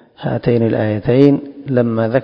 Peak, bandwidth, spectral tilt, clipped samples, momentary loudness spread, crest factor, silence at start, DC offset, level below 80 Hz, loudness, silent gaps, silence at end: 0 dBFS; 5.6 kHz; -10.5 dB/octave; 0.2%; 8 LU; 14 dB; 0.2 s; under 0.1%; -46 dBFS; -15 LUFS; none; 0 s